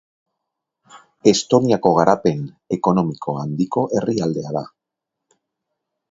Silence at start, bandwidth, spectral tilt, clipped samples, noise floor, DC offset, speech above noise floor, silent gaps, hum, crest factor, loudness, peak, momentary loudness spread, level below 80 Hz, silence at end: 0.95 s; 8 kHz; -6 dB/octave; under 0.1%; -82 dBFS; under 0.1%; 64 dB; none; none; 20 dB; -19 LUFS; 0 dBFS; 12 LU; -58 dBFS; 1.45 s